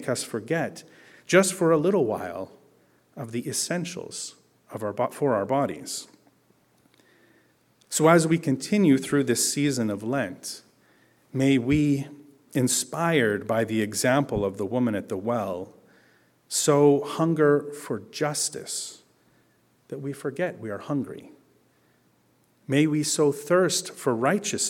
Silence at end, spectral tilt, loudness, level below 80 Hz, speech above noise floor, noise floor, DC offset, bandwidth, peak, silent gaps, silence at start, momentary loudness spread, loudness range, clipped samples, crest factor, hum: 0 s; -4.5 dB/octave; -25 LUFS; -60 dBFS; 40 dB; -64 dBFS; under 0.1%; 17 kHz; -4 dBFS; none; 0 s; 15 LU; 8 LU; under 0.1%; 22 dB; none